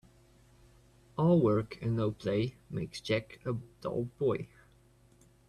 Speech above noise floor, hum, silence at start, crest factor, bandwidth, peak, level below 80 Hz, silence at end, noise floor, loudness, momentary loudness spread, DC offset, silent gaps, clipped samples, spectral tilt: 31 dB; none; 1.15 s; 18 dB; 12 kHz; -16 dBFS; -62 dBFS; 1.05 s; -63 dBFS; -33 LUFS; 12 LU; under 0.1%; none; under 0.1%; -7.5 dB/octave